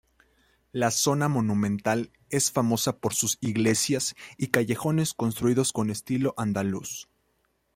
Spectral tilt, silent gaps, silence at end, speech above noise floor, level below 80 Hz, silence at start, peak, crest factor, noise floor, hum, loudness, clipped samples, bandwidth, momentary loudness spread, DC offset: -4.5 dB/octave; none; 0.7 s; 46 dB; -62 dBFS; 0.75 s; -4 dBFS; 24 dB; -72 dBFS; none; -26 LUFS; under 0.1%; 16.5 kHz; 7 LU; under 0.1%